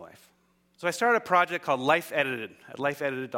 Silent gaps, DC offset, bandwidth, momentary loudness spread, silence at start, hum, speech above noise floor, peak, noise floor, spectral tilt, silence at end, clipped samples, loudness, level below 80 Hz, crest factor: none; under 0.1%; 17 kHz; 9 LU; 0 s; none; 40 dB; -6 dBFS; -67 dBFS; -4 dB/octave; 0 s; under 0.1%; -27 LUFS; -74 dBFS; 22 dB